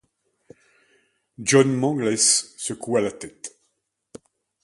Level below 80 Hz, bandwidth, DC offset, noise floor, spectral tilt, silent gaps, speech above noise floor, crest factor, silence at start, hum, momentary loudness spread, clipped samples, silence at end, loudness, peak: -66 dBFS; 11.5 kHz; under 0.1%; -74 dBFS; -3.5 dB/octave; none; 53 dB; 22 dB; 1.4 s; none; 19 LU; under 0.1%; 1.15 s; -20 LUFS; -4 dBFS